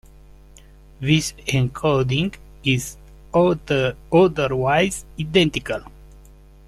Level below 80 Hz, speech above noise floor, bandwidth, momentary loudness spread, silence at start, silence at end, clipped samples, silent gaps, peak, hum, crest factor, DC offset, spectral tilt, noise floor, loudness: -44 dBFS; 26 dB; 14 kHz; 10 LU; 1 s; 0.8 s; under 0.1%; none; -4 dBFS; none; 18 dB; under 0.1%; -5.5 dB/octave; -46 dBFS; -20 LUFS